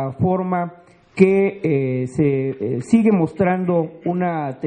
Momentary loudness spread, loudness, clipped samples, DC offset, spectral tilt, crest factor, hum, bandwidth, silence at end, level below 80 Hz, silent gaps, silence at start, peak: 9 LU; -19 LUFS; under 0.1%; under 0.1%; -9 dB/octave; 18 dB; none; 9.6 kHz; 0 s; -54 dBFS; none; 0 s; 0 dBFS